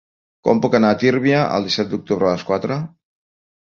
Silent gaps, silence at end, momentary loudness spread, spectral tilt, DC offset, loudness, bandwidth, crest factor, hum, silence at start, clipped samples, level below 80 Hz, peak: none; 0.75 s; 9 LU; -6.5 dB/octave; under 0.1%; -18 LUFS; 7.2 kHz; 18 dB; none; 0.45 s; under 0.1%; -54 dBFS; -2 dBFS